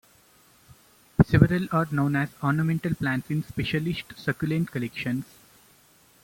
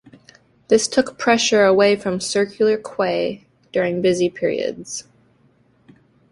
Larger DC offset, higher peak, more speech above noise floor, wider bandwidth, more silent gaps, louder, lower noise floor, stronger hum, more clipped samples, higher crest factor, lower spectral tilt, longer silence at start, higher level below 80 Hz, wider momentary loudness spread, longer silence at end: neither; about the same, -2 dBFS vs -2 dBFS; second, 33 dB vs 39 dB; first, 16.5 kHz vs 11.5 kHz; neither; second, -26 LUFS vs -19 LUFS; about the same, -58 dBFS vs -57 dBFS; neither; neither; first, 24 dB vs 18 dB; first, -7.5 dB/octave vs -3.5 dB/octave; first, 1.2 s vs 0.7 s; first, -48 dBFS vs -60 dBFS; about the same, 10 LU vs 12 LU; second, 1 s vs 1.3 s